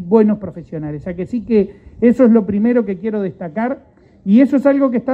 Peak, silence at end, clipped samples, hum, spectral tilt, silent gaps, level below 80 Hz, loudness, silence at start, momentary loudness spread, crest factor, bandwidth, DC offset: 0 dBFS; 0 s; under 0.1%; none; -10 dB/octave; none; -48 dBFS; -16 LUFS; 0 s; 14 LU; 14 dB; 4.4 kHz; under 0.1%